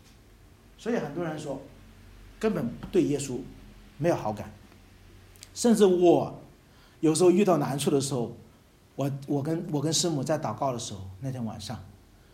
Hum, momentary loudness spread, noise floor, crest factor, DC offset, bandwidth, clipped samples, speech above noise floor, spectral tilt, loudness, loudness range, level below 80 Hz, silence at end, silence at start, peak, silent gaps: none; 17 LU; -57 dBFS; 20 dB; under 0.1%; 16 kHz; under 0.1%; 31 dB; -5.5 dB/octave; -27 LUFS; 7 LU; -56 dBFS; 0.4 s; 0.8 s; -8 dBFS; none